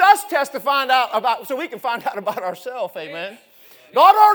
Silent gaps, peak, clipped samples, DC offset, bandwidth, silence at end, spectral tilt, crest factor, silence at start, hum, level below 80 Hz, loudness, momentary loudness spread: none; 0 dBFS; under 0.1%; under 0.1%; over 20 kHz; 0 s; -2 dB/octave; 18 dB; 0 s; none; -76 dBFS; -19 LUFS; 15 LU